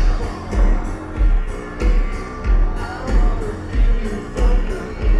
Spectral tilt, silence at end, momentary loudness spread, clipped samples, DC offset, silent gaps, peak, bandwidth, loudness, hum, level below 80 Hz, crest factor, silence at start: -7 dB/octave; 0 s; 6 LU; under 0.1%; under 0.1%; none; -4 dBFS; 8.2 kHz; -22 LUFS; none; -18 dBFS; 12 dB; 0 s